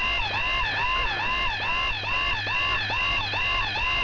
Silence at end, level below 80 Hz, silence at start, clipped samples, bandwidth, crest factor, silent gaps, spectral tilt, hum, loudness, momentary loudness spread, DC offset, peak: 0 s; -38 dBFS; 0 s; under 0.1%; 6 kHz; 12 dB; none; -3 dB/octave; none; -24 LUFS; 1 LU; under 0.1%; -14 dBFS